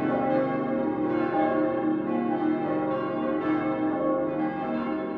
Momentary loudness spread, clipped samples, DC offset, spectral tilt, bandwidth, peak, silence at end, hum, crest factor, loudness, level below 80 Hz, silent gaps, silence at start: 3 LU; under 0.1%; under 0.1%; -10 dB/octave; 4.6 kHz; -12 dBFS; 0 s; none; 14 dB; -27 LUFS; -60 dBFS; none; 0 s